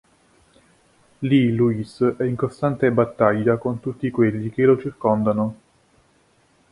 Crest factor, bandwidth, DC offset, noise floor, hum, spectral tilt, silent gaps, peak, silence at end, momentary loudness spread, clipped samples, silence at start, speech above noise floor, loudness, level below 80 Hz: 20 dB; 11 kHz; under 0.1%; -60 dBFS; none; -9 dB/octave; none; -2 dBFS; 1.15 s; 7 LU; under 0.1%; 1.2 s; 40 dB; -21 LUFS; -56 dBFS